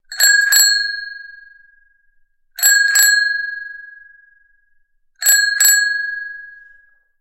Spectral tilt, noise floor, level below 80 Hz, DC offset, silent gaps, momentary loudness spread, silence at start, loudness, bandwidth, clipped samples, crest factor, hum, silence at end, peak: 7.5 dB/octave; -58 dBFS; -64 dBFS; under 0.1%; none; 21 LU; 0.1 s; -12 LUFS; 17 kHz; under 0.1%; 18 dB; none; 0.7 s; 0 dBFS